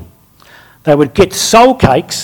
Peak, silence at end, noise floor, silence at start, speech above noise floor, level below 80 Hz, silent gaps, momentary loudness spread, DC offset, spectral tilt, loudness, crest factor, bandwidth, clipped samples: 0 dBFS; 0 s; -42 dBFS; 0 s; 33 dB; -34 dBFS; none; 6 LU; under 0.1%; -4.5 dB/octave; -9 LUFS; 10 dB; 19.5 kHz; 2%